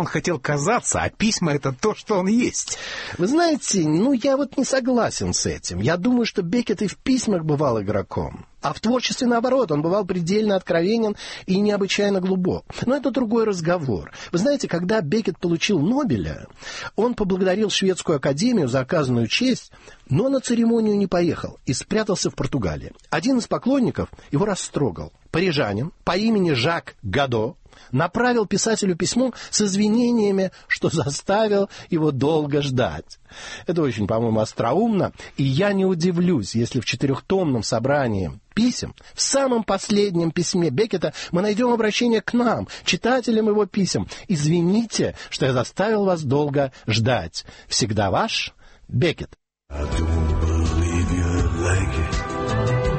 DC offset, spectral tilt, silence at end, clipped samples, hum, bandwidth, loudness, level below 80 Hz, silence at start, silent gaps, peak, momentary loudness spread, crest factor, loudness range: under 0.1%; -5 dB/octave; 0 s; under 0.1%; none; 8.8 kHz; -21 LUFS; -38 dBFS; 0 s; none; -6 dBFS; 7 LU; 16 dB; 2 LU